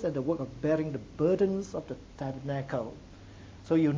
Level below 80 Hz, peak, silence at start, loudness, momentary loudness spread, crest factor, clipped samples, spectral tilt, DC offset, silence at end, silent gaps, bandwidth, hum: -54 dBFS; -14 dBFS; 0 s; -32 LUFS; 22 LU; 16 dB; under 0.1%; -8 dB/octave; under 0.1%; 0 s; none; 7.6 kHz; none